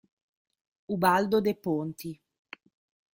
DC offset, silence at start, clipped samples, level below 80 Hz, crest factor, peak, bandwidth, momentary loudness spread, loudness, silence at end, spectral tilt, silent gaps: under 0.1%; 0.9 s; under 0.1%; -68 dBFS; 22 dB; -8 dBFS; 16.5 kHz; 25 LU; -27 LUFS; 1 s; -6 dB/octave; none